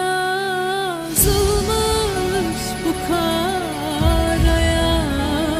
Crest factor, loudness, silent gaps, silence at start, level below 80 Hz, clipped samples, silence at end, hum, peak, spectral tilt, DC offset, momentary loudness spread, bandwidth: 16 dB; -19 LUFS; none; 0 s; -26 dBFS; under 0.1%; 0 s; none; -2 dBFS; -4 dB/octave; under 0.1%; 6 LU; 16 kHz